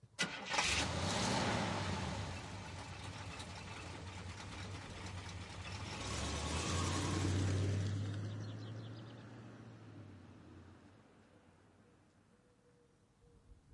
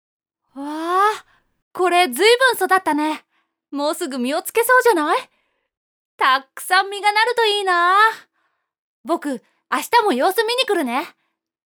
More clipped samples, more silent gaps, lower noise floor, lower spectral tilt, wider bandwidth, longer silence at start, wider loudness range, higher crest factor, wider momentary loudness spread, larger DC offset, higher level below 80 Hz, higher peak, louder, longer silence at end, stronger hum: neither; second, none vs 1.62-1.71 s, 5.77-6.18 s, 8.78-9.04 s; about the same, -70 dBFS vs -70 dBFS; first, -4 dB/octave vs -1 dB/octave; second, 11.5 kHz vs over 20 kHz; second, 0.05 s vs 0.55 s; first, 19 LU vs 3 LU; first, 22 dB vs 16 dB; first, 19 LU vs 16 LU; neither; first, -58 dBFS vs -76 dBFS; second, -20 dBFS vs -2 dBFS; second, -40 LUFS vs -18 LUFS; second, 0.2 s vs 0.55 s; neither